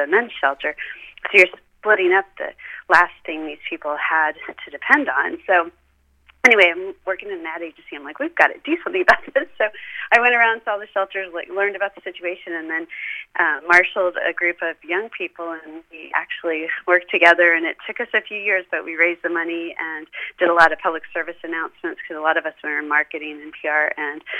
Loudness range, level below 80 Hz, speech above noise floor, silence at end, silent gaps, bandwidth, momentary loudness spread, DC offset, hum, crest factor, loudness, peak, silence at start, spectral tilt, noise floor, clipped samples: 3 LU; -60 dBFS; 36 dB; 0 s; none; 13.5 kHz; 16 LU; under 0.1%; none; 20 dB; -19 LUFS; 0 dBFS; 0 s; -3 dB/octave; -56 dBFS; under 0.1%